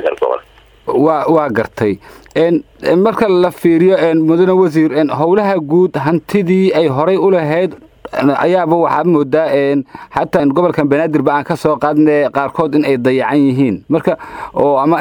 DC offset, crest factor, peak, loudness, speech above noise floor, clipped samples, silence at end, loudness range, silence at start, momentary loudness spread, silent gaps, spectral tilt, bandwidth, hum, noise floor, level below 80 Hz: under 0.1%; 12 dB; 0 dBFS; -13 LUFS; 28 dB; under 0.1%; 0 s; 2 LU; 0 s; 7 LU; none; -8 dB/octave; 19 kHz; none; -40 dBFS; -50 dBFS